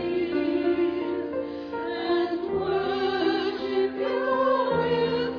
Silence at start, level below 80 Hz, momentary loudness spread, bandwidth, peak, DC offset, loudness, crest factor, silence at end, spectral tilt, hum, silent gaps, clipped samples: 0 s; -58 dBFS; 7 LU; 5.4 kHz; -12 dBFS; under 0.1%; -26 LUFS; 12 dB; 0 s; -7.5 dB/octave; none; none; under 0.1%